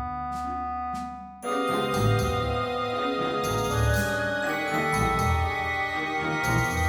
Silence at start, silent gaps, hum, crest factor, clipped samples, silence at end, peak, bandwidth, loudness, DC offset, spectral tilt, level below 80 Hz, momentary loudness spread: 0 s; none; none; 16 dB; under 0.1%; 0 s; -12 dBFS; over 20 kHz; -26 LUFS; under 0.1%; -5 dB/octave; -38 dBFS; 7 LU